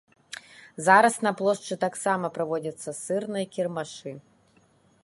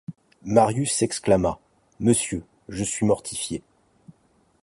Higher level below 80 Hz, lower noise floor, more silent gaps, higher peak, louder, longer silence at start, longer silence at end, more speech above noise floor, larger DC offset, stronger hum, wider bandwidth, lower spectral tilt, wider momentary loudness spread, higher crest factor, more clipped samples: second, -76 dBFS vs -50 dBFS; about the same, -62 dBFS vs -63 dBFS; neither; about the same, -4 dBFS vs -2 dBFS; second, -26 LUFS vs -23 LUFS; first, 0.3 s vs 0.1 s; second, 0.85 s vs 1.05 s; about the same, 37 dB vs 40 dB; neither; neither; about the same, 11.5 kHz vs 11.5 kHz; about the same, -4 dB/octave vs -5 dB/octave; first, 23 LU vs 16 LU; about the same, 24 dB vs 22 dB; neither